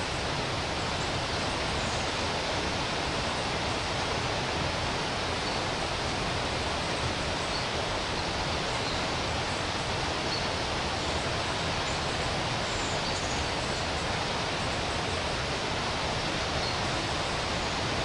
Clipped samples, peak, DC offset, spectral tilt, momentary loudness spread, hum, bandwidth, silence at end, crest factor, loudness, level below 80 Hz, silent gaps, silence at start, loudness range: under 0.1%; -18 dBFS; under 0.1%; -3.5 dB/octave; 1 LU; none; 11.5 kHz; 0 s; 14 dB; -29 LUFS; -44 dBFS; none; 0 s; 0 LU